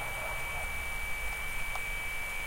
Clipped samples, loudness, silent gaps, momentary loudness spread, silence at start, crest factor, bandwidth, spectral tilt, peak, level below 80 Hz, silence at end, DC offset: under 0.1%; -35 LUFS; none; 1 LU; 0 s; 14 dB; 16 kHz; -2 dB/octave; -22 dBFS; -42 dBFS; 0 s; under 0.1%